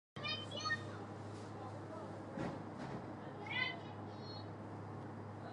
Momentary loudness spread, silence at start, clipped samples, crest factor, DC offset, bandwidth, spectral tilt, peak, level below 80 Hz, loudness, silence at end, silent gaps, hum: 9 LU; 0.15 s; under 0.1%; 20 dB; under 0.1%; 11 kHz; -5 dB/octave; -26 dBFS; -70 dBFS; -45 LUFS; 0 s; none; none